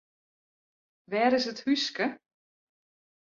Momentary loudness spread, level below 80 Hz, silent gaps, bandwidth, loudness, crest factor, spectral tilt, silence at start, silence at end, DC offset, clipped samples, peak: 7 LU; -76 dBFS; none; 7.6 kHz; -28 LUFS; 20 dB; -3.5 dB/octave; 1.1 s; 1.1 s; under 0.1%; under 0.1%; -12 dBFS